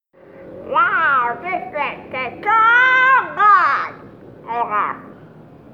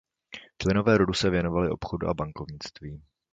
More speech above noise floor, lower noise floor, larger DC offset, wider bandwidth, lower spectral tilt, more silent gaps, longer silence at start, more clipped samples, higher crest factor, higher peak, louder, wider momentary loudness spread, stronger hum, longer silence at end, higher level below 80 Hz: about the same, 23 dB vs 22 dB; second, -42 dBFS vs -48 dBFS; neither; second, 7.2 kHz vs 9.2 kHz; second, -4.5 dB/octave vs -6 dB/octave; neither; about the same, 0.35 s vs 0.3 s; neither; about the same, 16 dB vs 20 dB; first, -2 dBFS vs -8 dBFS; first, -15 LUFS vs -26 LUFS; second, 15 LU vs 22 LU; neither; about the same, 0.45 s vs 0.35 s; second, -60 dBFS vs -46 dBFS